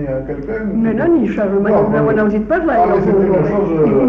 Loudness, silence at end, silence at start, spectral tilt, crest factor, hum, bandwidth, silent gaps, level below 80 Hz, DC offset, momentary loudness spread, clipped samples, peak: -14 LUFS; 0 s; 0 s; -10.5 dB/octave; 10 dB; none; 6 kHz; none; -36 dBFS; under 0.1%; 7 LU; under 0.1%; -4 dBFS